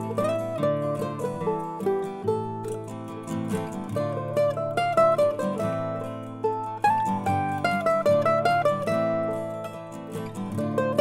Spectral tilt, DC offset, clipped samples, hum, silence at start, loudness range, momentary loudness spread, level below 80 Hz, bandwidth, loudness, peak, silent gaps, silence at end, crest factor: -6.5 dB/octave; under 0.1%; under 0.1%; none; 0 s; 5 LU; 12 LU; -60 dBFS; 16 kHz; -26 LUFS; -8 dBFS; none; 0 s; 18 dB